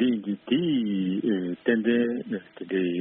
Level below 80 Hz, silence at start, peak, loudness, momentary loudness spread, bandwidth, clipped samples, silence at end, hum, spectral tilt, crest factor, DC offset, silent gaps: -70 dBFS; 0 s; -10 dBFS; -26 LUFS; 8 LU; 3.8 kHz; under 0.1%; 0 s; none; -5.5 dB/octave; 16 dB; under 0.1%; none